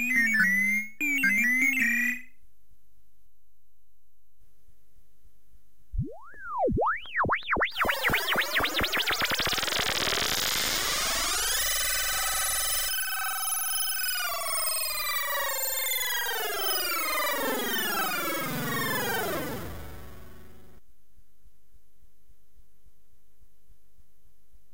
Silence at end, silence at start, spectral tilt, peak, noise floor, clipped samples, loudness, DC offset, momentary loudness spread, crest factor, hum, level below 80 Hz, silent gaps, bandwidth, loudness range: 4.25 s; 0 s; -1.5 dB/octave; -12 dBFS; -73 dBFS; under 0.1%; -26 LUFS; 1%; 8 LU; 18 dB; none; -48 dBFS; none; 16.5 kHz; 9 LU